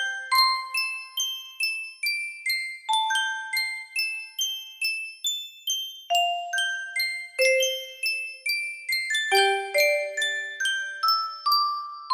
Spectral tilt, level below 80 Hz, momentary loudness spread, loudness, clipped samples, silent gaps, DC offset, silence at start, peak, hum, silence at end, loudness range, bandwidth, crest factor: 2.5 dB/octave; -80 dBFS; 7 LU; -25 LUFS; under 0.1%; none; under 0.1%; 0 s; -8 dBFS; none; 0 s; 3 LU; 16 kHz; 18 dB